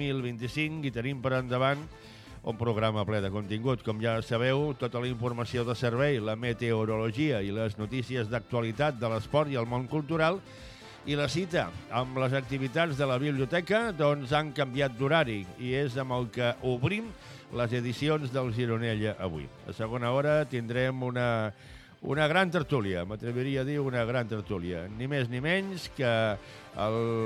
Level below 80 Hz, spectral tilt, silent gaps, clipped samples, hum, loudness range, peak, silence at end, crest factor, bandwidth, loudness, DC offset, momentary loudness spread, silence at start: -56 dBFS; -6.5 dB/octave; none; under 0.1%; none; 2 LU; -12 dBFS; 0 s; 18 dB; 13 kHz; -30 LUFS; under 0.1%; 8 LU; 0 s